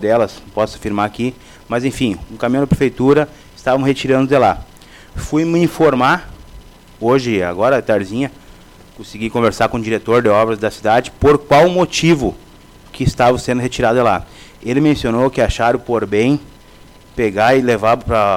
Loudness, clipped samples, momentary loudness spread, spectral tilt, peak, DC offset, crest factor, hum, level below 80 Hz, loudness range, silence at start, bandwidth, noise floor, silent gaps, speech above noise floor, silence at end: -15 LUFS; under 0.1%; 9 LU; -6 dB/octave; -4 dBFS; under 0.1%; 12 dB; none; -36 dBFS; 3 LU; 0 s; 16.5 kHz; -42 dBFS; none; 27 dB; 0 s